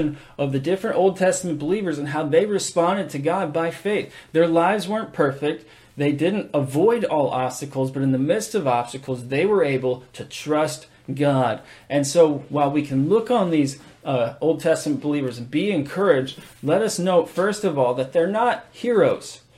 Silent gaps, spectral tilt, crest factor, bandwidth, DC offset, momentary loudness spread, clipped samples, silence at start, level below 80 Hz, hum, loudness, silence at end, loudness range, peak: none; -5.5 dB/octave; 16 dB; 14.5 kHz; under 0.1%; 8 LU; under 0.1%; 0 s; -60 dBFS; none; -22 LUFS; 0.2 s; 2 LU; -4 dBFS